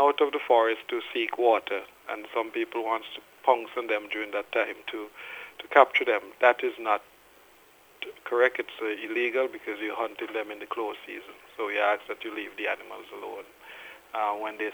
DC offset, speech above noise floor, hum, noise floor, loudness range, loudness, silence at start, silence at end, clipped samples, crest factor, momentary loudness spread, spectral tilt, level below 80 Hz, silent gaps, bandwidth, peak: under 0.1%; 29 dB; none; -57 dBFS; 6 LU; -28 LUFS; 0 s; 0 s; under 0.1%; 26 dB; 17 LU; -3 dB/octave; -76 dBFS; none; over 20 kHz; -2 dBFS